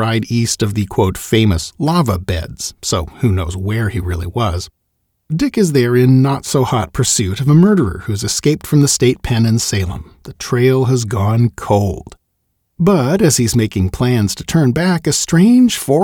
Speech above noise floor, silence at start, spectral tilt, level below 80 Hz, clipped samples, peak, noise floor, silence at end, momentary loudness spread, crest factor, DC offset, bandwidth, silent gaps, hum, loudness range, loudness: 54 dB; 0 s; -5.5 dB/octave; -36 dBFS; under 0.1%; 0 dBFS; -67 dBFS; 0 s; 9 LU; 14 dB; under 0.1%; 19.5 kHz; none; none; 5 LU; -14 LUFS